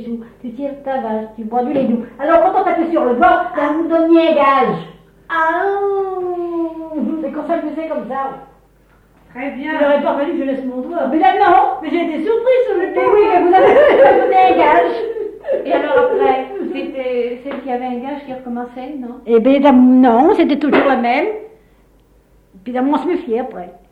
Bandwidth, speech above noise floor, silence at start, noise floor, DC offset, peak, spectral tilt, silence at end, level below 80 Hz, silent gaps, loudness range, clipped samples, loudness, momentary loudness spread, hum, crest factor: 5.2 kHz; 37 dB; 0 s; -51 dBFS; under 0.1%; -2 dBFS; -7 dB/octave; 0.2 s; -50 dBFS; none; 9 LU; under 0.1%; -14 LUFS; 16 LU; none; 14 dB